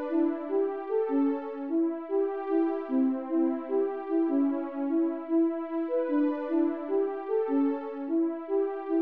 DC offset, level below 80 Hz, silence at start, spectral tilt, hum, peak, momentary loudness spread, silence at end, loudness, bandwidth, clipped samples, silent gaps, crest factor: 0.1%; under -90 dBFS; 0 s; -8.5 dB/octave; none; -16 dBFS; 3 LU; 0 s; -29 LUFS; 3.8 kHz; under 0.1%; none; 12 dB